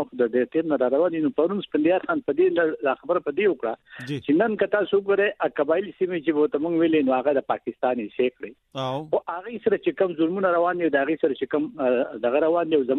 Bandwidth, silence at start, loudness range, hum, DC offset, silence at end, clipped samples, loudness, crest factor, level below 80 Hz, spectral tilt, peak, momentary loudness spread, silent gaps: 6.6 kHz; 0 s; 2 LU; none; under 0.1%; 0 s; under 0.1%; -23 LUFS; 16 dB; -68 dBFS; -8 dB/octave; -6 dBFS; 6 LU; none